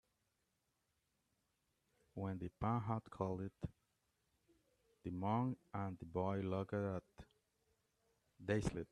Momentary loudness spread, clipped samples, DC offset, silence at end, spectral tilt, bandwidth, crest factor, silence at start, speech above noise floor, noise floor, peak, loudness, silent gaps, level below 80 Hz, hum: 11 LU; under 0.1%; under 0.1%; 0.05 s; -8 dB/octave; 11 kHz; 22 dB; 2.15 s; 43 dB; -86 dBFS; -24 dBFS; -44 LUFS; none; -66 dBFS; none